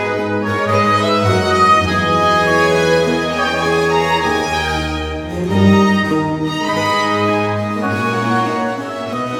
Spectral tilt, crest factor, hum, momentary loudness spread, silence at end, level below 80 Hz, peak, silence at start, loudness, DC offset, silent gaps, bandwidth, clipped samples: -5.5 dB/octave; 14 dB; none; 8 LU; 0 s; -38 dBFS; 0 dBFS; 0 s; -15 LUFS; under 0.1%; none; 16.5 kHz; under 0.1%